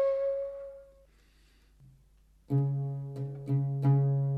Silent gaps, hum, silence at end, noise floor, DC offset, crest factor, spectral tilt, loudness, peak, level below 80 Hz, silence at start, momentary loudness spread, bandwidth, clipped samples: none; none; 0 s; -63 dBFS; under 0.1%; 14 dB; -11.5 dB/octave; -31 LUFS; -16 dBFS; -62 dBFS; 0 s; 16 LU; 2.5 kHz; under 0.1%